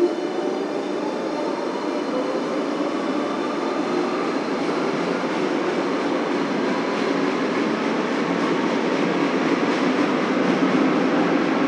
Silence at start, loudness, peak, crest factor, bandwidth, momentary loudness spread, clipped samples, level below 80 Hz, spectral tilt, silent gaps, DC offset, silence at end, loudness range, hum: 0 s; -22 LUFS; -6 dBFS; 14 dB; 10.5 kHz; 5 LU; under 0.1%; -66 dBFS; -5.5 dB/octave; none; under 0.1%; 0 s; 4 LU; none